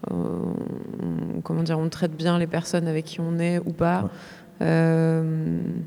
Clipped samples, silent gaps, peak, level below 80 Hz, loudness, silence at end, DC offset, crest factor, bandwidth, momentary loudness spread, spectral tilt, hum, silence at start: under 0.1%; none; -8 dBFS; -56 dBFS; -25 LUFS; 0 s; under 0.1%; 16 dB; 11.5 kHz; 10 LU; -7 dB/octave; none; 0 s